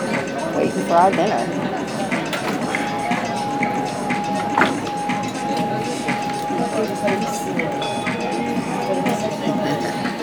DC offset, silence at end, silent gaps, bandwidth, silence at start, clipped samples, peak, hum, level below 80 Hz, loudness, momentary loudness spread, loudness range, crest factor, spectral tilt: under 0.1%; 0 s; none; over 20 kHz; 0 s; under 0.1%; 0 dBFS; none; -54 dBFS; -21 LUFS; 5 LU; 2 LU; 20 dB; -5 dB/octave